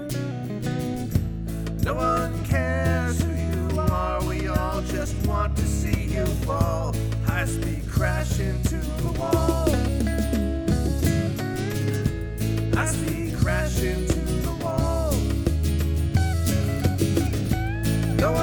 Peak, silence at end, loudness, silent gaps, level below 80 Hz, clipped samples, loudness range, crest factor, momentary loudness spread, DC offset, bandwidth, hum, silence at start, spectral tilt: -8 dBFS; 0 s; -25 LUFS; none; -30 dBFS; under 0.1%; 1 LU; 14 dB; 4 LU; under 0.1%; over 20 kHz; none; 0 s; -6 dB/octave